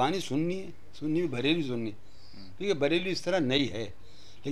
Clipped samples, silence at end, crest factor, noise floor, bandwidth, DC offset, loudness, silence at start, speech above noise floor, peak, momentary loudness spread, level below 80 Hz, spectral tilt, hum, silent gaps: under 0.1%; 0 s; 18 dB; -51 dBFS; 13.5 kHz; 1%; -30 LUFS; 0 s; 22 dB; -14 dBFS; 14 LU; -60 dBFS; -5.5 dB/octave; none; none